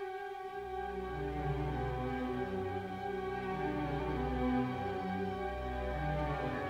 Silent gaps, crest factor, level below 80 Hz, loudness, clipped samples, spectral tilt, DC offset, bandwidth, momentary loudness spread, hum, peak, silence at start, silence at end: none; 14 dB; -46 dBFS; -38 LUFS; under 0.1%; -8 dB/octave; under 0.1%; 15.5 kHz; 5 LU; none; -22 dBFS; 0 s; 0 s